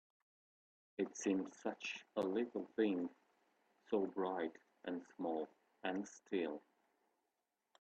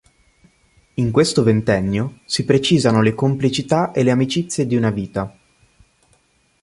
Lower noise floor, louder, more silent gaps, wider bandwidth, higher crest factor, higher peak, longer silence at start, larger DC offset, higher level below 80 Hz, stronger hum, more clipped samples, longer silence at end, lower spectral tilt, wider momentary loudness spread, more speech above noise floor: first, -88 dBFS vs -60 dBFS; second, -43 LUFS vs -18 LUFS; neither; second, 8.4 kHz vs 11.5 kHz; about the same, 20 dB vs 18 dB; second, -24 dBFS vs -2 dBFS; about the same, 1 s vs 1 s; neither; second, -86 dBFS vs -48 dBFS; neither; neither; second, 1.2 s vs 1.35 s; about the same, -5 dB/octave vs -6 dB/octave; about the same, 9 LU vs 9 LU; first, 47 dB vs 43 dB